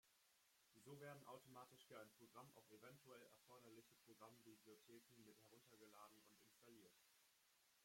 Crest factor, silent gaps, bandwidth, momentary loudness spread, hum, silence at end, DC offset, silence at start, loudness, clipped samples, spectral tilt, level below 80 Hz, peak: 20 dB; none; 16.5 kHz; 8 LU; none; 0 s; under 0.1%; 0.05 s; -66 LUFS; under 0.1%; -4 dB/octave; under -90 dBFS; -48 dBFS